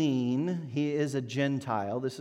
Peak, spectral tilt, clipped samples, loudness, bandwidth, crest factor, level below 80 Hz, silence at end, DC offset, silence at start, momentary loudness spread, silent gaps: -16 dBFS; -6.5 dB/octave; under 0.1%; -31 LUFS; 13 kHz; 14 dB; -76 dBFS; 0 s; under 0.1%; 0 s; 3 LU; none